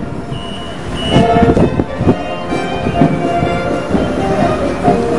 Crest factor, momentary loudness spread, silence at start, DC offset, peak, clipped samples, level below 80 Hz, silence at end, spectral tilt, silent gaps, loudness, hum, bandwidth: 14 dB; 13 LU; 0 s; 3%; 0 dBFS; under 0.1%; -30 dBFS; 0 s; -7 dB/octave; none; -14 LUFS; none; 11.5 kHz